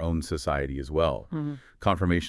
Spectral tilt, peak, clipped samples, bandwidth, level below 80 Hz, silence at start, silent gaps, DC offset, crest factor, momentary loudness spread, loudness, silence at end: -6.5 dB/octave; -8 dBFS; under 0.1%; 12 kHz; -42 dBFS; 0 s; none; under 0.1%; 18 dB; 7 LU; -29 LUFS; 0 s